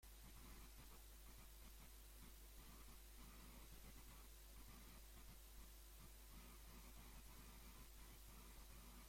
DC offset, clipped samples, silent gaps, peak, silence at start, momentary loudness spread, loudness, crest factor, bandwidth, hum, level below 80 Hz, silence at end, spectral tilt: under 0.1%; under 0.1%; none; -48 dBFS; 0 s; 1 LU; -63 LUFS; 12 dB; 16.5 kHz; none; -64 dBFS; 0 s; -3 dB/octave